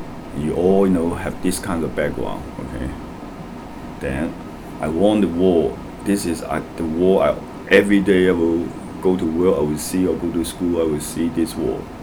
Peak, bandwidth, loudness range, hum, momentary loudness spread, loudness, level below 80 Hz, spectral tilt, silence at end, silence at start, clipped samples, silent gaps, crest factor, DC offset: 0 dBFS; over 20 kHz; 8 LU; none; 14 LU; -20 LUFS; -40 dBFS; -6 dB/octave; 0 s; 0 s; under 0.1%; none; 20 dB; under 0.1%